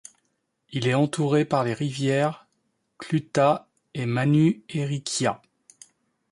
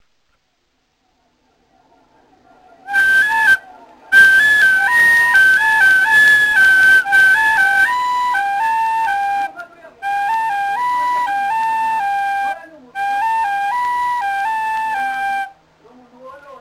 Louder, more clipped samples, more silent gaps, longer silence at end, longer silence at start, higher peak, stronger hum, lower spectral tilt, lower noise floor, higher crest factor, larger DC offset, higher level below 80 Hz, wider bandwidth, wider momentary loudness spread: second, -24 LUFS vs -13 LUFS; neither; neither; first, 0.95 s vs 0.05 s; second, 0.7 s vs 2.85 s; second, -8 dBFS vs 0 dBFS; neither; first, -6 dB/octave vs 0 dB/octave; first, -74 dBFS vs -65 dBFS; about the same, 18 dB vs 16 dB; neither; second, -64 dBFS vs -54 dBFS; second, 11.5 kHz vs 16 kHz; about the same, 12 LU vs 12 LU